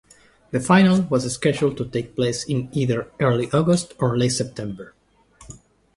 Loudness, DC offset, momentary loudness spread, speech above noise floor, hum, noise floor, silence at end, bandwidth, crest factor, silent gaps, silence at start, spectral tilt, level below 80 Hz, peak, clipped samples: -21 LUFS; under 0.1%; 12 LU; 31 dB; none; -52 dBFS; 0.4 s; 11.5 kHz; 18 dB; none; 0.55 s; -5.5 dB/octave; -52 dBFS; -4 dBFS; under 0.1%